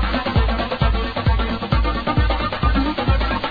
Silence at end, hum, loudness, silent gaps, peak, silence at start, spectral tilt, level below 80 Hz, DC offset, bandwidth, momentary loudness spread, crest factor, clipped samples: 0 s; none; -20 LUFS; none; -4 dBFS; 0 s; -8.5 dB/octave; -22 dBFS; under 0.1%; 5 kHz; 1 LU; 14 dB; under 0.1%